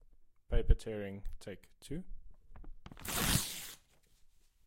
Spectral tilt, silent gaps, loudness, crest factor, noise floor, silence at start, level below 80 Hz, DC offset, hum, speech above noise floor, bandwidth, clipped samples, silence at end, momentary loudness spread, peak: -3.5 dB/octave; none; -38 LUFS; 24 dB; -65 dBFS; 0.2 s; -40 dBFS; under 0.1%; none; 30 dB; 16.5 kHz; under 0.1%; 0.4 s; 24 LU; -12 dBFS